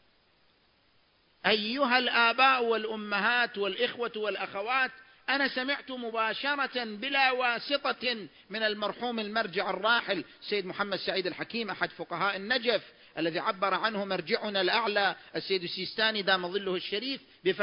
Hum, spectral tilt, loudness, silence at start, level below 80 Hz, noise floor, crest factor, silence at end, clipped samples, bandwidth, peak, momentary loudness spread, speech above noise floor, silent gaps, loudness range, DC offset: none; -7.5 dB/octave; -29 LUFS; 1.45 s; -76 dBFS; -67 dBFS; 22 dB; 0 s; under 0.1%; 5.4 kHz; -8 dBFS; 8 LU; 37 dB; none; 4 LU; under 0.1%